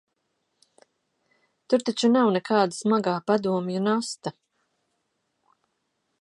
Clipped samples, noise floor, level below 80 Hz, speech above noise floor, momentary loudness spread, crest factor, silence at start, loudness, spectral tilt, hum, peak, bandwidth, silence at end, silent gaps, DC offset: under 0.1%; -76 dBFS; -76 dBFS; 53 dB; 7 LU; 20 dB; 1.7 s; -24 LUFS; -5.5 dB/octave; none; -6 dBFS; 11.5 kHz; 1.9 s; none; under 0.1%